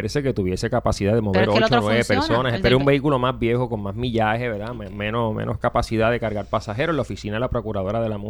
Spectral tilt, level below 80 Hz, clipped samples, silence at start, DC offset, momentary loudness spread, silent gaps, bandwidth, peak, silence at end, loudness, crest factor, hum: -6.5 dB/octave; -38 dBFS; under 0.1%; 0 s; under 0.1%; 8 LU; none; 19 kHz; -4 dBFS; 0 s; -21 LUFS; 18 dB; none